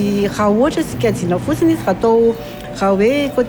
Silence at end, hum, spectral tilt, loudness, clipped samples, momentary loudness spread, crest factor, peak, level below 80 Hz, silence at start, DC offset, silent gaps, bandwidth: 0 s; none; -6.5 dB/octave; -15 LUFS; under 0.1%; 5 LU; 12 dB; -4 dBFS; -40 dBFS; 0 s; under 0.1%; none; over 20 kHz